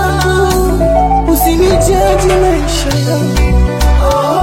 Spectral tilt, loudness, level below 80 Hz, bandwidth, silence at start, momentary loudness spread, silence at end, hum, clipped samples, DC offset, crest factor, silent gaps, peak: -5.5 dB/octave; -11 LUFS; -14 dBFS; 16.5 kHz; 0 s; 3 LU; 0 s; none; under 0.1%; under 0.1%; 10 dB; none; 0 dBFS